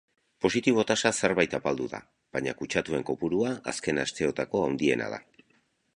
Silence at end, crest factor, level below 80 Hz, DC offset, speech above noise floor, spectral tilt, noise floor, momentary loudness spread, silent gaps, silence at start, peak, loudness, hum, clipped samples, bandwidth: 0.75 s; 24 dB; -60 dBFS; under 0.1%; 41 dB; -4 dB/octave; -69 dBFS; 9 LU; none; 0.4 s; -6 dBFS; -28 LUFS; none; under 0.1%; 11.5 kHz